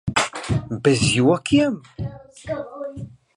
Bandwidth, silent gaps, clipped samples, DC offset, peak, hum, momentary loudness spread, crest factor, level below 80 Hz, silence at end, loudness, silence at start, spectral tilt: 11.5 kHz; none; under 0.1%; under 0.1%; -2 dBFS; none; 16 LU; 18 dB; -44 dBFS; 0.3 s; -20 LUFS; 0.05 s; -5 dB/octave